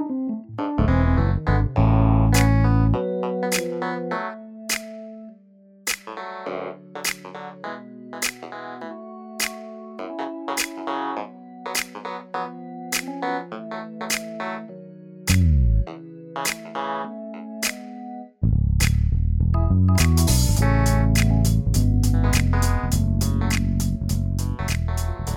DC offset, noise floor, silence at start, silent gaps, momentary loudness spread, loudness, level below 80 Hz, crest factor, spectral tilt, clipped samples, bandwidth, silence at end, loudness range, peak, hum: under 0.1%; -51 dBFS; 0 s; none; 17 LU; -23 LUFS; -28 dBFS; 18 dB; -5.5 dB/octave; under 0.1%; 19 kHz; 0 s; 11 LU; -4 dBFS; none